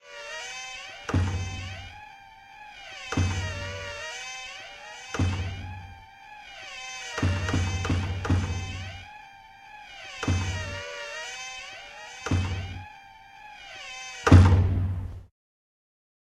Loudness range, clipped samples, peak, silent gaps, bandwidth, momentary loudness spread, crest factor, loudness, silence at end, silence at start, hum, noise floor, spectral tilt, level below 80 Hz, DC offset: 10 LU; under 0.1%; -2 dBFS; none; 10 kHz; 19 LU; 26 dB; -28 LUFS; 1.05 s; 0.05 s; none; -49 dBFS; -5.5 dB/octave; -40 dBFS; under 0.1%